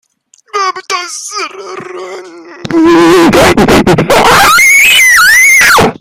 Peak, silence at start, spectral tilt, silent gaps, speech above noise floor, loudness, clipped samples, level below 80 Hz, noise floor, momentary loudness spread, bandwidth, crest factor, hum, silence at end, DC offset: 0 dBFS; 0.55 s; -3 dB/octave; none; 40 dB; -4 LUFS; 1%; -32 dBFS; -47 dBFS; 21 LU; over 20 kHz; 6 dB; none; 0.05 s; under 0.1%